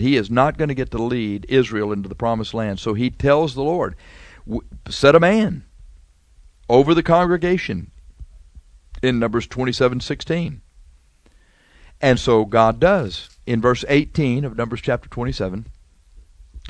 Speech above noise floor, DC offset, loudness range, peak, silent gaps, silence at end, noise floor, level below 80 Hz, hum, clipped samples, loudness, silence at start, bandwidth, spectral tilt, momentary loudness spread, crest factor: 35 dB; under 0.1%; 5 LU; 0 dBFS; none; 0 s; -54 dBFS; -40 dBFS; none; under 0.1%; -19 LUFS; 0 s; 11 kHz; -6.5 dB/octave; 13 LU; 20 dB